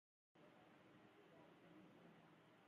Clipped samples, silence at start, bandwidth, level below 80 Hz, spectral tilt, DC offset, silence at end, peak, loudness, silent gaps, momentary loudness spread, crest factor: under 0.1%; 0.35 s; 6.8 kHz; under -90 dBFS; -4.5 dB/octave; under 0.1%; 0 s; -56 dBFS; -68 LUFS; none; 2 LU; 14 dB